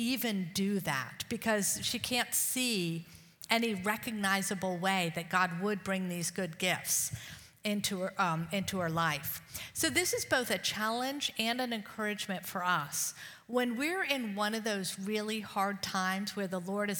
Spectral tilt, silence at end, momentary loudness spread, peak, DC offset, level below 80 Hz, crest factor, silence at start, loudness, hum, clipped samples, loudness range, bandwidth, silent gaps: -3 dB/octave; 0 s; 6 LU; -10 dBFS; under 0.1%; -68 dBFS; 24 dB; 0 s; -33 LUFS; none; under 0.1%; 2 LU; 19 kHz; none